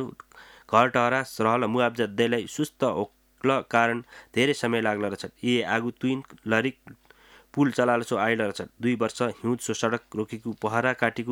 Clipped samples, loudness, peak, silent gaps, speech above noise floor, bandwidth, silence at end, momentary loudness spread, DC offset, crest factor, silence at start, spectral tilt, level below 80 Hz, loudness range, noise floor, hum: under 0.1%; -26 LUFS; -4 dBFS; none; 29 dB; 17 kHz; 0 s; 9 LU; under 0.1%; 22 dB; 0 s; -5 dB/octave; -66 dBFS; 2 LU; -55 dBFS; none